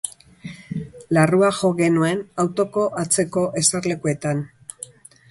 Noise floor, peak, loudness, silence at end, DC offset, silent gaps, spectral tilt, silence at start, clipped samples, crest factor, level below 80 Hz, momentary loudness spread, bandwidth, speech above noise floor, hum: -41 dBFS; -2 dBFS; -20 LUFS; 0.85 s; under 0.1%; none; -4.5 dB/octave; 0.05 s; under 0.1%; 18 dB; -58 dBFS; 19 LU; 11.5 kHz; 22 dB; none